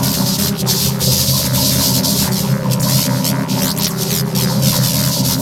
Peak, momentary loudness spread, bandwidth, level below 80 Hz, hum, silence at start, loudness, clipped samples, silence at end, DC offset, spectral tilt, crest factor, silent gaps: 0 dBFS; 4 LU; 18.5 kHz; -38 dBFS; none; 0 s; -14 LUFS; under 0.1%; 0 s; under 0.1%; -4 dB/octave; 14 dB; none